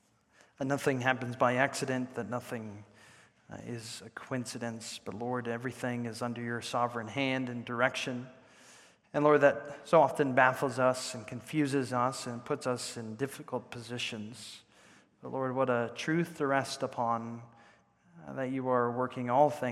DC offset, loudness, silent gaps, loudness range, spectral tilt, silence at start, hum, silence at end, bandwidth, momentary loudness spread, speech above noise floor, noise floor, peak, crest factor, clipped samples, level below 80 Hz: under 0.1%; -32 LUFS; none; 10 LU; -5 dB/octave; 0.6 s; none; 0 s; 15.5 kHz; 16 LU; 33 dB; -65 dBFS; -10 dBFS; 24 dB; under 0.1%; -78 dBFS